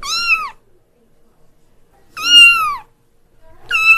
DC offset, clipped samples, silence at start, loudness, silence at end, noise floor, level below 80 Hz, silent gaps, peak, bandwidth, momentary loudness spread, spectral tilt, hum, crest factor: under 0.1%; under 0.1%; 0 s; -9 LUFS; 0 s; -52 dBFS; -46 dBFS; none; 0 dBFS; 16 kHz; 20 LU; 2.5 dB/octave; none; 16 dB